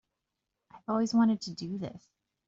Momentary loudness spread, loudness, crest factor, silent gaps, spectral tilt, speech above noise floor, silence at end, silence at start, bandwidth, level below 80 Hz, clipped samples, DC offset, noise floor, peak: 16 LU; -30 LUFS; 18 dB; none; -6 dB/octave; 56 dB; 0.5 s; 0.75 s; 7.8 kHz; -70 dBFS; under 0.1%; under 0.1%; -86 dBFS; -16 dBFS